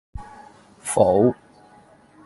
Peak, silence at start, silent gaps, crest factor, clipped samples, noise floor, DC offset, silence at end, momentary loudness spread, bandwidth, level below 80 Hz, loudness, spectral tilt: -4 dBFS; 0.15 s; none; 20 dB; under 0.1%; -52 dBFS; under 0.1%; 0.95 s; 24 LU; 11.5 kHz; -46 dBFS; -19 LUFS; -6 dB/octave